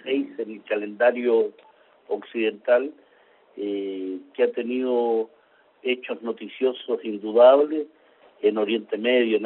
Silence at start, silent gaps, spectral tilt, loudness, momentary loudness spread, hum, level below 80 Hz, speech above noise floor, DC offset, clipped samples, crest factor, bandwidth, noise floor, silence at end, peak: 0.05 s; none; -2 dB/octave; -23 LUFS; 13 LU; none; -76 dBFS; 35 dB; under 0.1%; under 0.1%; 20 dB; 4.2 kHz; -57 dBFS; 0 s; -4 dBFS